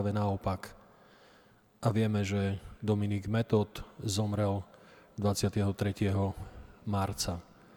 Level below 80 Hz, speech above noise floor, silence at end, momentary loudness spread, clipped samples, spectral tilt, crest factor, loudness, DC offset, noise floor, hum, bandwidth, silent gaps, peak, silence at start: -54 dBFS; 31 dB; 0.35 s; 12 LU; under 0.1%; -6 dB/octave; 20 dB; -33 LUFS; under 0.1%; -62 dBFS; none; 18.5 kHz; none; -14 dBFS; 0 s